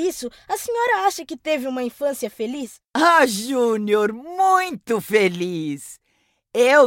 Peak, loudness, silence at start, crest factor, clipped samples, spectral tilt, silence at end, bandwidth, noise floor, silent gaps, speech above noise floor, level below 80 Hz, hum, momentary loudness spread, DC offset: -2 dBFS; -21 LUFS; 0 s; 18 dB; under 0.1%; -3.5 dB/octave; 0 s; 17 kHz; -67 dBFS; none; 47 dB; -64 dBFS; none; 12 LU; under 0.1%